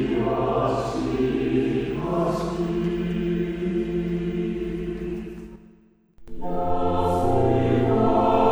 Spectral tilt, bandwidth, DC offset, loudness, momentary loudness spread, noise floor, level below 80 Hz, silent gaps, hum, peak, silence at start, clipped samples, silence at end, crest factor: -8 dB/octave; over 20 kHz; under 0.1%; -24 LUFS; 10 LU; -55 dBFS; -40 dBFS; none; none; -6 dBFS; 0 s; under 0.1%; 0 s; 16 dB